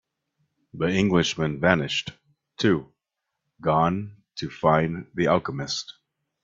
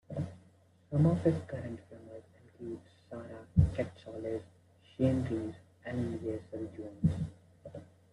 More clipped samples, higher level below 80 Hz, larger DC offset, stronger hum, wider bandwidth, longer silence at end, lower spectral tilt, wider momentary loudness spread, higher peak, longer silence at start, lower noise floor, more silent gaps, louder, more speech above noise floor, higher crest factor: neither; about the same, -56 dBFS vs -52 dBFS; neither; neither; second, 7.8 kHz vs 11 kHz; first, 0.5 s vs 0.3 s; second, -5.5 dB/octave vs -9.5 dB/octave; second, 12 LU vs 21 LU; first, 0 dBFS vs -12 dBFS; first, 0.75 s vs 0.1 s; first, -83 dBFS vs -64 dBFS; neither; first, -24 LUFS vs -35 LUFS; first, 59 dB vs 30 dB; about the same, 24 dB vs 24 dB